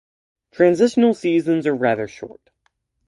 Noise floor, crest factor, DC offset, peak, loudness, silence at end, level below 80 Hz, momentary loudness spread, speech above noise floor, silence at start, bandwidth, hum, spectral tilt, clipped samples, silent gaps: -69 dBFS; 18 dB; under 0.1%; -2 dBFS; -18 LUFS; 0.8 s; -64 dBFS; 16 LU; 51 dB; 0.6 s; 11.5 kHz; none; -6.5 dB/octave; under 0.1%; none